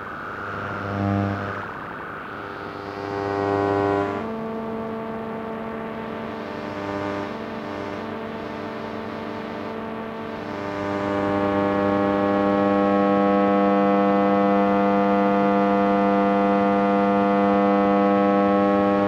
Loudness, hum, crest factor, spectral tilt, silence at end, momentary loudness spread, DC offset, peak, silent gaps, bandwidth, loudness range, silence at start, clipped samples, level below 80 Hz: -22 LUFS; none; 16 dB; -8 dB/octave; 0 s; 12 LU; under 0.1%; -6 dBFS; none; 7.4 kHz; 11 LU; 0 s; under 0.1%; -54 dBFS